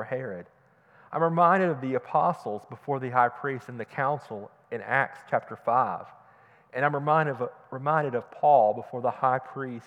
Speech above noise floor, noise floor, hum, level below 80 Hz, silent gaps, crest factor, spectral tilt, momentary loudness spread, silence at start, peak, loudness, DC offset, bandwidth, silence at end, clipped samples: 31 dB; -58 dBFS; none; -82 dBFS; none; 20 dB; -8 dB/octave; 15 LU; 0 s; -8 dBFS; -27 LUFS; under 0.1%; 9.4 kHz; 0.05 s; under 0.1%